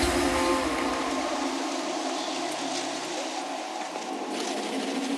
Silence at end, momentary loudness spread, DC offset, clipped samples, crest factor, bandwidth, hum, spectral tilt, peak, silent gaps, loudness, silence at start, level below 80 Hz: 0 s; 8 LU; under 0.1%; under 0.1%; 18 dB; 14 kHz; none; -3 dB/octave; -12 dBFS; none; -29 LUFS; 0 s; -48 dBFS